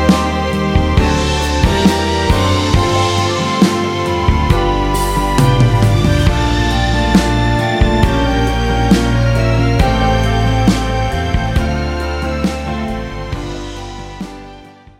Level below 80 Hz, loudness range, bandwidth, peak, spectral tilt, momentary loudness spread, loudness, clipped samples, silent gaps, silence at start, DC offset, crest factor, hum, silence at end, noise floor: -20 dBFS; 5 LU; 16.5 kHz; 0 dBFS; -6 dB/octave; 11 LU; -14 LUFS; under 0.1%; none; 0 s; under 0.1%; 14 dB; none; 0.3 s; -37 dBFS